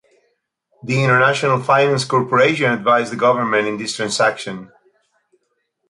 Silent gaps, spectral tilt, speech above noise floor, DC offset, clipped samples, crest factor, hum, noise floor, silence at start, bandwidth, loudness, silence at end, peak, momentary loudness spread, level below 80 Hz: none; -4.5 dB/octave; 53 dB; under 0.1%; under 0.1%; 16 dB; none; -70 dBFS; 0.85 s; 11.5 kHz; -16 LUFS; 1.25 s; -2 dBFS; 9 LU; -62 dBFS